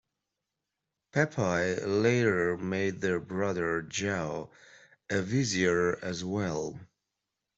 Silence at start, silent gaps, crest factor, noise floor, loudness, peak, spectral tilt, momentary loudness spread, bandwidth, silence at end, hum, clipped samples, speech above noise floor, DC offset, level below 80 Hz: 1.15 s; none; 20 dB; -86 dBFS; -30 LUFS; -10 dBFS; -5 dB/octave; 9 LU; 8.2 kHz; 0.75 s; none; under 0.1%; 57 dB; under 0.1%; -64 dBFS